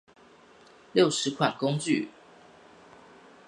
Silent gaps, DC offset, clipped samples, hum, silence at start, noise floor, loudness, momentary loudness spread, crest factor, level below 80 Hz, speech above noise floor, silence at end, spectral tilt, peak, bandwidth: none; under 0.1%; under 0.1%; none; 0.95 s; -55 dBFS; -27 LUFS; 6 LU; 22 dB; -74 dBFS; 30 dB; 1.4 s; -4.5 dB/octave; -8 dBFS; 11.5 kHz